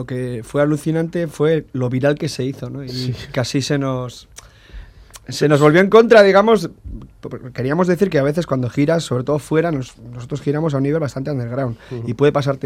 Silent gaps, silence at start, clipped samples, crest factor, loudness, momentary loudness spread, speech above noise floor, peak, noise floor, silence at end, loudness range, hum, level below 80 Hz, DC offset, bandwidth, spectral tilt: none; 0 s; under 0.1%; 18 dB; -17 LUFS; 18 LU; 22 dB; 0 dBFS; -39 dBFS; 0.1 s; 8 LU; none; -46 dBFS; under 0.1%; 15 kHz; -6.5 dB/octave